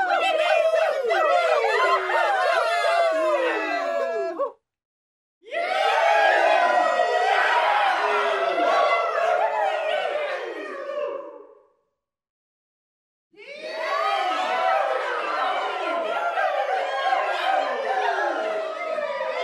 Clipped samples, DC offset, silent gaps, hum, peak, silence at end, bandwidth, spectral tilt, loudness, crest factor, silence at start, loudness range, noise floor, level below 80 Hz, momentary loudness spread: under 0.1%; under 0.1%; 4.85-5.41 s, 12.29-13.30 s; none; -6 dBFS; 0 s; 12.5 kHz; -0.5 dB/octave; -22 LUFS; 16 dB; 0 s; 10 LU; -78 dBFS; -82 dBFS; 10 LU